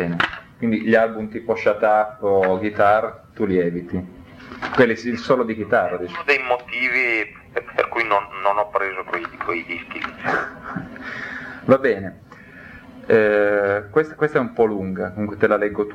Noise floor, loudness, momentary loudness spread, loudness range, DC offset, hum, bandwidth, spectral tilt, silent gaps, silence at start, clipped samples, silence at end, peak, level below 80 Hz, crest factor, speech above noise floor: -42 dBFS; -20 LUFS; 13 LU; 5 LU; under 0.1%; none; 9.2 kHz; -7 dB/octave; none; 0 s; under 0.1%; 0 s; -2 dBFS; -54 dBFS; 20 dB; 22 dB